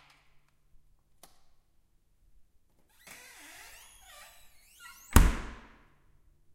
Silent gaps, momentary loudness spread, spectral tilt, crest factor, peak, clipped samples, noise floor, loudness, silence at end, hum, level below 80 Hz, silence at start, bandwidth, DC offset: none; 27 LU; -5 dB/octave; 34 dB; -2 dBFS; under 0.1%; -67 dBFS; -28 LUFS; 1.05 s; none; -36 dBFS; 5.1 s; 16 kHz; under 0.1%